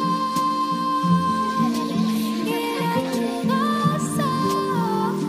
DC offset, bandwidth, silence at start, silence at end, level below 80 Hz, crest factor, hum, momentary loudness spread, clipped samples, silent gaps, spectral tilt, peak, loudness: under 0.1%; 15.5 kHz; 0 s; 0 s; -60 dBFS; 14 dB; none; 3 LU; under 0.1%; none; -5.5 dB/octave; -8 dBFS; -22 LUFS